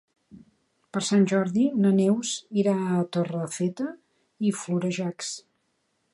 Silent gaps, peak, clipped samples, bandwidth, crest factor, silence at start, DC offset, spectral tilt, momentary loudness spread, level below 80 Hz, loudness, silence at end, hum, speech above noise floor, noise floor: none; -12 dBFS; under 0.1%; 11.5 kHz; 16 dB; 0.35 s; under 0.1%; -5.5 dB/octave; 13 LU; -72 dBFS; -26 LUFS; 0.75 s; none; 49 dB; -73 dBFS